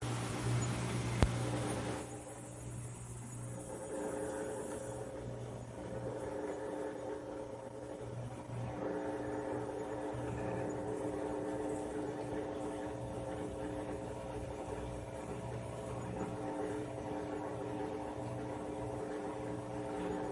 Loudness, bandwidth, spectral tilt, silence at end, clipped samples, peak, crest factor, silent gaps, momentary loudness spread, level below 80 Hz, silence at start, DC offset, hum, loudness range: -41 LUFS; 11.5 kHz; -6 dB/octave; 0 s; under 0.1%; -8 dBFS; 32 dB; none; 8 LU; -54 dBFS; 0 s; under 0.1%; none; 4 LU